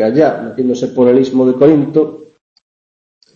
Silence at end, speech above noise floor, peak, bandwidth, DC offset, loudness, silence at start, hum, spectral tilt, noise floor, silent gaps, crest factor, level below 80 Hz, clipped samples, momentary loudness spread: 1.1 s; over 79 dB; 0 dBFS; 7.4 kHz; under 0.1%; -12 LUFS; 0 s; none; -8 dB/octave; under -90 dBFS; none; 12 dB; -54 dBFS; under 0.1%; 8 LU